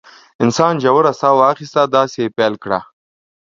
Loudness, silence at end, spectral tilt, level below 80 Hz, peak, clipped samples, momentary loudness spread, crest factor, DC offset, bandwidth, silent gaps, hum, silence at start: -15 LUFS; 0.6 s; -5.5 dB/octave; -60 dBFS; 0 dBFS; under 0.1%; 8 LU; 16 dB; under 0.1%; 7.8 kHz; none; none; 0.4 s